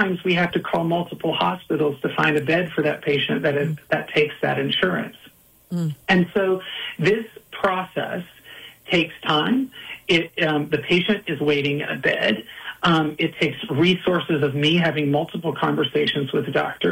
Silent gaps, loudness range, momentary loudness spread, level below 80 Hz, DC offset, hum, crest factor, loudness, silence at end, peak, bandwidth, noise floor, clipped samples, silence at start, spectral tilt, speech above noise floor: none; 3 LU; 8 LU; -58 dBFS; under 0.1%; none; 18 dB; -21 LUFS; 0 s; -4 dBFS; 16.5 kHz; -43 dBFS; under 0.1%; 0 s; -6 dB/octave; 22 dB